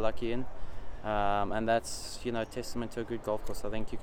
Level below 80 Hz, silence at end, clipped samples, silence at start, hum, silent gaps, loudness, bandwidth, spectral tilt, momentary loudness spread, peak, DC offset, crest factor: -44 dBFS; 0 s; under 0.1%; 0 s; none; none; -34 LUFS; 16 kHz; -5 dB/octave; 10 LU; -14 dBFS; under 0.1%; 18 dB